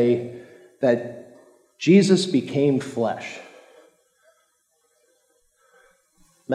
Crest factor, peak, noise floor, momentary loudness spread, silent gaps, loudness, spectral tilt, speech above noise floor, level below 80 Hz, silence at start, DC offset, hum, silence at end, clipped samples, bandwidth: 20 dB; -4 dBFS; -68 dBFS; 21 LU; none; -21 LUFS; -6 dB/octave; 48 dB; -76 dBFS; 0 s; under 0.1%; none; 0 s; under 0.1%; 11 kHz